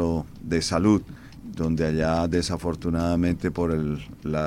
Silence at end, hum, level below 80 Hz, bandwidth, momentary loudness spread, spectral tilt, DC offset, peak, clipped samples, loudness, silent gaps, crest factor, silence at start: 0 s; none; -42 dBFS; 14 kHz; 8 LU; -6 dB/octave; under 0.1%; -8 dBFS; under 0.1%; -25 LUFS; none; 18 dB; 0 s